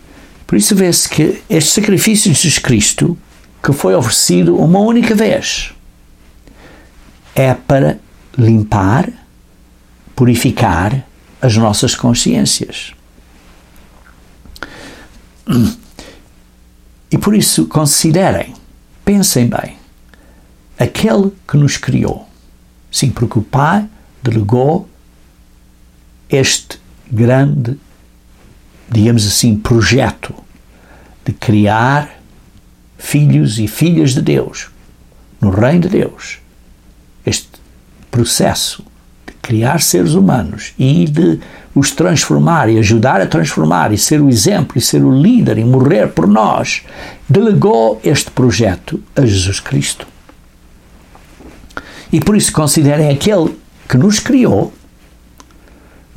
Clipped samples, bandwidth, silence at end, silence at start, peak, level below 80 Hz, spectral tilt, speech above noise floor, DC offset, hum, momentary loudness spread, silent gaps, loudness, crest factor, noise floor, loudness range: under 0.1%; 16.5 kHz; 1.45 s; 0.5 s; 0 dBFS; -38 dBFS; -5 dB/octave; 33 dB; under 0.1%; none; 14 LU; none; -12 LUFS; 12 dB; -44 dBFS; 6 LU